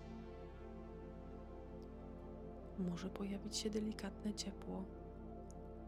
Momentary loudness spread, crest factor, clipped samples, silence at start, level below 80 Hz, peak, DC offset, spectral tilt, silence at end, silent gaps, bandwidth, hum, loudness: 11 LU; 18 dB; under 0.1%; 0 s; -56 dBFS; -30 dBFS; under 0.1%; -5 dB/octave; 0 s; none; 15.5 kHz; 50 Hz at -65 dBFS; -48 LUFS